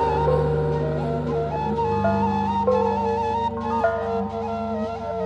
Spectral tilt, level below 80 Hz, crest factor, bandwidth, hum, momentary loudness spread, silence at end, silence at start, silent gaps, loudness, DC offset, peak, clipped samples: -8.5 dB/octave; -38 dBFS; 14 dB; 8.4 kHz; 50 Hz at -30 dBFS; 6 LU; 0 s; 0 s; none; -23 LUFS; under 0.1%; -8 dBFS; under 0.1%